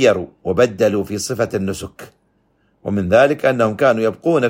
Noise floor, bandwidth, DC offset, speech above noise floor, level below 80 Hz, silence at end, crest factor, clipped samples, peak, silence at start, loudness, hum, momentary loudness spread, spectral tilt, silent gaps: -61 dBFS; 16.5 kHz; under 0.1%; 45 dB; -50 dBFS; 0 s; 16 dB; under 0.1%; 0 dBFS; 0 s; -17 LUFS; none; 11 LU; -5.5 dB/octave; none